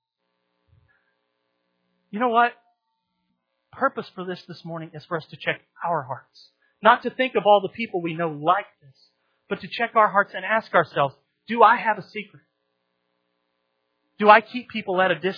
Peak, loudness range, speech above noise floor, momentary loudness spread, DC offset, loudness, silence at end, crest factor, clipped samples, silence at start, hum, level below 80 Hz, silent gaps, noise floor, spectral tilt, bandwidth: 0 dBFS; 8 LU; 55 dB; 19 LU; under 0.1%; -22 LUFS; 0 s; 24 dB; under 0.1%; 2.15 s; none; -76 dBFS; none; -77 dBFS; -7.5 dB/octave; 5.4 kHz